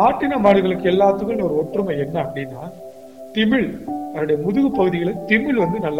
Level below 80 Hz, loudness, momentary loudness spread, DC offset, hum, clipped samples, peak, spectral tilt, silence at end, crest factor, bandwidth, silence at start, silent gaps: -48 dBFS; -19 LUFS; 14 LU; 0.3%; none; under 0.1%; -4 dBFS; -7.5 dB/octave; 0 s; 16 dB; 16.5 kHz; 0 s; none